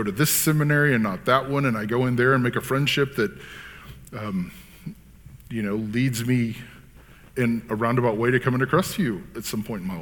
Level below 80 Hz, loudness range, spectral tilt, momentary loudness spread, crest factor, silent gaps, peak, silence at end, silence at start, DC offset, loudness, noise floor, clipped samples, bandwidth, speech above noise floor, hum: -50 dBFS; 7 LU; -5 dB/octave; 19 LU; 20 dB; none; -4 dBFS; 0 s; 0 s; under 0.1%; -23 LUFS; -48 dBFS; under 0.1%; 19 kHz; 25 dB; none